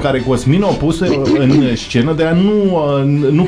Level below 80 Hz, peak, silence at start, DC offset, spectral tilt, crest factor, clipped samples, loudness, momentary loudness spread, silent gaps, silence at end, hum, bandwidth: -34 dBFS; -2 dBFS; 0 s; under 0.1%; -7 dB/octave; 10 dB; under 0.1%; -13 LUFS; 3 LU; none; 0 s; none; 11 kHz